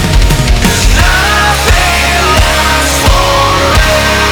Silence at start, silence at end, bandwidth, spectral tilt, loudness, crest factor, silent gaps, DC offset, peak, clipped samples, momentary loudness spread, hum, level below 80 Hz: 0 s; 0 s; over 20 kHz; -3.5 dB/octave; -8 LUFS; 8 dB; none; under 0.1%; 0 dBFS; 0.4%; 2 LU; none; -12 dBFS